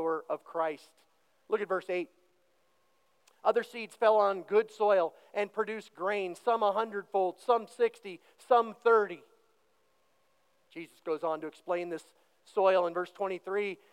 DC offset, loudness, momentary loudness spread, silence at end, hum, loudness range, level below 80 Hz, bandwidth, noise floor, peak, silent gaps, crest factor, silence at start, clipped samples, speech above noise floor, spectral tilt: under 0.1%; -31 LUFS; 15 LU; 0.2 s; none; 7 LU; under -90 dBFS; 12.5 kHz; -73 dBFS; -12 dBFS; none; 20 dB; 0 s; under 0.1%; 42 dB; -5 dB/octave